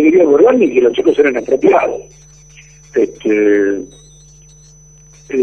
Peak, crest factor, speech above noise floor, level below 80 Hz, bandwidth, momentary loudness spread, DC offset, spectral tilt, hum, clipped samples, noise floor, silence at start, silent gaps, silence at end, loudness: 0 dBFS; 14 dB; 30 dB; -48 dBFS; 6.8 kHz; 12 LU; 0.1%; -5.5 dB/octave; none; under 0.1%; -42 dBFS; 0 s; none; 0 s; -12 LUFS